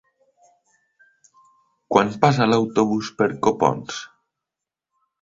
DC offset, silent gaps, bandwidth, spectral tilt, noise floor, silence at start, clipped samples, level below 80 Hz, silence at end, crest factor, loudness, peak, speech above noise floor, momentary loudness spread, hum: under 0.1%; none; 7.8 kHz; -6 dB/octave; -86 dBFS; 1.9 s; under 0.1%; -58 dBFS; 1.15 s; 22 dB; -20 LUFS; 0 dBFS; 67 dB; 14 LU; none